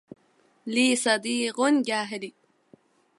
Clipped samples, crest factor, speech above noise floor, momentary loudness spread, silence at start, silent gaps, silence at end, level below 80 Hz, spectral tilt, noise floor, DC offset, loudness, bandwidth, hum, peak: under 0.1%; 20 dB; 39 dB; 15 LU; 0.65 s; none; 0.9 s; -80 dBFS; -2 dB/octave; -64 dBFS; under 0.1%; -24 LUFS; 11.5 kHz; none; -8 dBFS